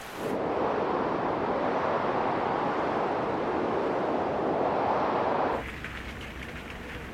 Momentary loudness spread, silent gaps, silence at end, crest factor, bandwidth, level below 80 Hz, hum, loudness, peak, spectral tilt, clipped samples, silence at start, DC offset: 11 LU; none; 0 s; 14 dB; 16 kHz; -52 dBFS; none; -29 LUFS; -14 dBFS; -6.5 dB/octave; under 0.1%; 0 s; under 0.1%